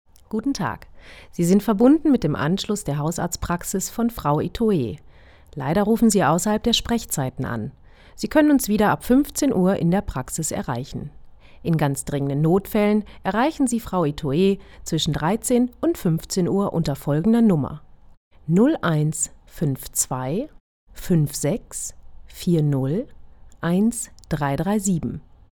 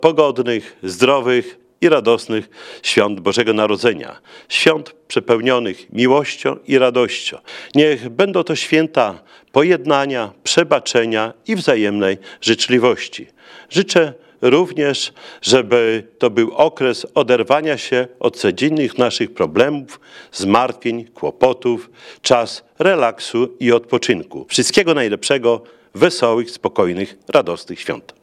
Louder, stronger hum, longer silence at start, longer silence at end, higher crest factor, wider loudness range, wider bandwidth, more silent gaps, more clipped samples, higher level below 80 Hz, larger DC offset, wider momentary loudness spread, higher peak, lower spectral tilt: second, -22 LUFS vs -16 LUFS; neither; first, 0.35 s vs 0 s; first, 0.35 s vs 0.2 s; about the same, 18 dB vs 16 dB; about the same, 4 LU vs 2 LU; first, over 20 kHz vs 13 kHz; first, 18.17-18.31 s, 20.60-20.87 s vs none; neither; first, -42 dBFS vs -62 dBFS; neither; first, 13 LU vs 9 LU; about the same, -2 dBFS vs 0 dBFS; first, -5.5 dB/octave vs -4 dB/octave